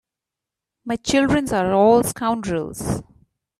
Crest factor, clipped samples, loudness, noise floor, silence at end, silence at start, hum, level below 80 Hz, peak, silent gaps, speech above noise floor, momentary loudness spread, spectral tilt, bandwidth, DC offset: 18 dB; under 0.1%; -20 LUFS; -86 dBFS; 0.55 s; 0.85 s; none; -46 dBFS; -4 dBFS; none; 67 dB; 13 LU; -5 dB/octave; 15 kHz; under 0.1%